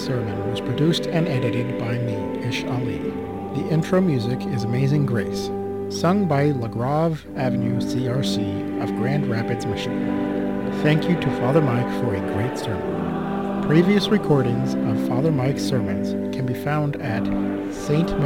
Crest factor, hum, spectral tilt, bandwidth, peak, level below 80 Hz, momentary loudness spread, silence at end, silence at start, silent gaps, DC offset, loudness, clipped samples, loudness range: 18 dB; none; -7 dB/octave; 16.5 kHz; -4 dBFS; -48 dBFS; 7 LU; 0 s; 0 s; none; 0.3%; -22 LUFS; under 0.1%; 3 LU